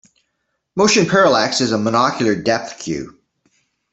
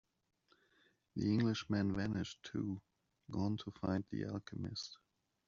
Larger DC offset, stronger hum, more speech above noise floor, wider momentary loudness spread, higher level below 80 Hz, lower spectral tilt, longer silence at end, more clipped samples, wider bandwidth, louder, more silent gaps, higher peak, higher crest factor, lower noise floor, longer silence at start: neither; neither; first, 56 dB vs 36 dB; first, 14 LU vs 11 LU; first, -56 dBFS vs -68 dBFS; second, -4 dB/octave vs -6 dB/octave; first, 0.8 s vs 0.5 s; neither; first, 8.4 kHz vs 7.4 kHz; first, -16 LUFS vs -40 LUFS; neither; first, -2 dBFS vs -24 dBFS; about the same, 16 dB vs 18 dB; about the same, -72 dBFS vs -75 dBFS; second, 0.75 s vs 1.15 s